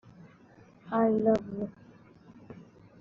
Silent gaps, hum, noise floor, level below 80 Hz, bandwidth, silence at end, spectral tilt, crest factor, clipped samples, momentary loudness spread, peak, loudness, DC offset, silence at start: none; none; -57 dBFS; -66 dBFS; 7 kHz; 0.4 s; -7.5 dB/octave; 20 dB; under 0.1%; 25 LU; -12 dBFS; -29 LUFS; under 0.1%; 0.85 s